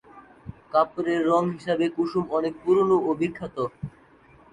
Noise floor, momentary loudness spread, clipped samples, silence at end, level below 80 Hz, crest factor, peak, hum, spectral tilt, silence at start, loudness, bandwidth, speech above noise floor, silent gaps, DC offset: -54 dBFS; 18 LU; under 0.1%; 0.65 s; -58 dBFS; 18 dB; -8 dBFS; none; -7.5 dB/octave; 0.15 s; -24 LUFS; 9.4 kHz; 31 dB; none; under 0.1%